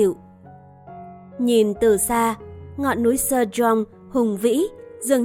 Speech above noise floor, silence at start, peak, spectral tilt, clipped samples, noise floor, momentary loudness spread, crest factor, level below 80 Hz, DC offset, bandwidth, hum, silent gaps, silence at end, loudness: 26 dB; 0 s; -4 dBFS; -4.5 dB/octave; under 0.1%; -45 dBFS; 19 LU; 16 dB; -50 dBFS; under 0.1%; 17 kHz; none; none; 0 s; -20 LUFS